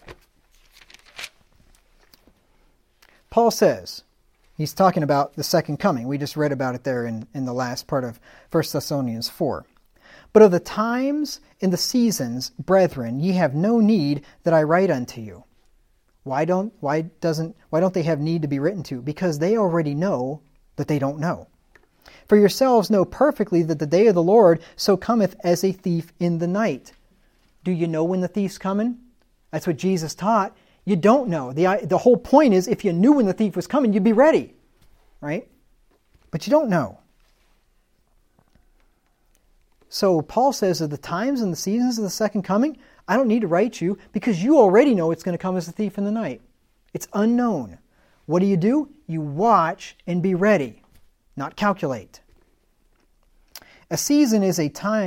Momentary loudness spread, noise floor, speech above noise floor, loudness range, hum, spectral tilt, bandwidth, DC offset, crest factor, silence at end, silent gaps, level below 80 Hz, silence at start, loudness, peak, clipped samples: 14 LU; -63 dBFS; 42 dB; 8 LU; none; -6 dB/octave; 16.5 kHz; under 0.1%; 22 dB; 0 s; none; -56 dBFS; 0.05 s; -21 LUFS; 0 dBFS; under 0.1%